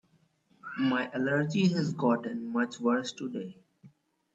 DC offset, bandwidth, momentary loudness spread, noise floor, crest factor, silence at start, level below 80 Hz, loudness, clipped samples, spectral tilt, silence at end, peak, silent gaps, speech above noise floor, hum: under 0.1%; 8 kHz; 13 LU; -69 dBFS; 18 dB; 0.65 s; -74 dBFS; -30 LUFS; under 0.1%; -6 dB/octave; 0.45 s; -14 dBFS; none; 39 dB; none